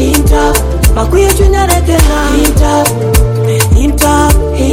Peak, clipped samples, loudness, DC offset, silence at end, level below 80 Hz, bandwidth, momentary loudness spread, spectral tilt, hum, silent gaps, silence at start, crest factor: 0 dBFS; 2%; -9 LUFS; under 0.1%; 0 s; -12 dBFS; over 20 kHz; 2 LU; -5 dB/octave; none; none; 0 s; 8 dB